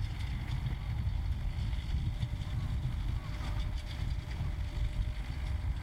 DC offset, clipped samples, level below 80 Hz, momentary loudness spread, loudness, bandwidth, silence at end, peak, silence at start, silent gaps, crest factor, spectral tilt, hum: under 0.1%; under 0.1%; -36 dBFS; 3 LU; -37 LUFS; 12.5 kHz; 0 s; -22 dBFS; 0 s; none; 12 dB; -6.5 dB/octave; none